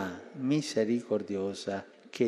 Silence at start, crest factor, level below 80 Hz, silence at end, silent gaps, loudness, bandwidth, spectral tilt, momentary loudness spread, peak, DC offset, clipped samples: 0 s; 18 dB; -78 dBFS; 0 s; none; -32 LUFS; 13 kHz; -5.5 dB/octave; 10 LU; -14 dBFS; under 0.1%; under 0.1%